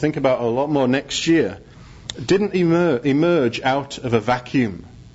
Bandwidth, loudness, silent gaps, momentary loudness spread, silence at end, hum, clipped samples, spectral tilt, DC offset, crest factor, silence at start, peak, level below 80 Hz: 8 kHz; -19 LUFS; none; 10 LU; 0.05 s; none; under 0.1%; -5.5 dB/octave; under 0.1%; 14 dB; 0 s; -4 dBFS; -50 dBFS